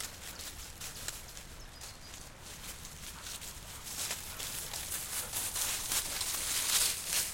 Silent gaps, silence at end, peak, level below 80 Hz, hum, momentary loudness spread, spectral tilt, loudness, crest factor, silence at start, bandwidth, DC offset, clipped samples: none; 0 s; -16 dBFS; -54 dBFS; none; 18 LU; 0 dB/octave; -35 LUFS; 24 dB; 0 s; 17 kHz; under 0.1%; under 0.1%